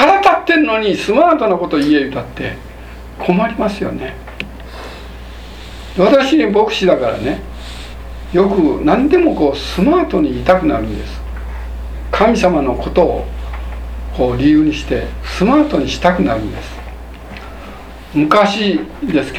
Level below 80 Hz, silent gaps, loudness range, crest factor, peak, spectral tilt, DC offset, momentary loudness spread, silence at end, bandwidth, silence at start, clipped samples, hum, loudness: -28 dBFS; none; 4 LU; 14 dB; 0 dBFS; -6 dB/octave; under 0.1%; 20 LU; 0 s; 13.5 kHz; 0 s; under 0.1%; none; -14 LUFS